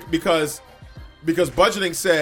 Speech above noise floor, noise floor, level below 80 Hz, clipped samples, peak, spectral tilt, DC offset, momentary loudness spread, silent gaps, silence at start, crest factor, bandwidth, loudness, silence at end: 22 dB; -42 dBFS; -44 dBFS; under 0.1%; -4 dBFS; -3.5 dB/octave; under 0.1%; 10 LU; none; 0 s; 18 dB; 18 kHz; -20 LUFS; 0 s